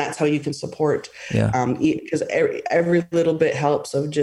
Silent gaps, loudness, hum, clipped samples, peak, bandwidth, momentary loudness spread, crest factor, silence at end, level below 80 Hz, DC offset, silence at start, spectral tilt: none; -21 LUFS; none; under 0.1%; -6 dBFS; 12 kHz; 6 LU; 16 dB; 0 s; -54 dBFS; under 0.1%; 0 s; -6.5 dB/octave